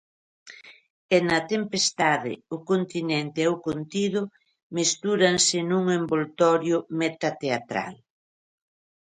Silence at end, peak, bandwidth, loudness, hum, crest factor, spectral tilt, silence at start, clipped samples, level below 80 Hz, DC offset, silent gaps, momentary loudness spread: 1.15 s; -6 dBFS; 10.5 kHz; -24 LUFS; none; 20 dB; -3.5 dB/octave; 0.45 s; under 0.1%; -66 dBFS; under 0.1%; 0.90-1.09 s, 4.63-4.70 s; 10 LU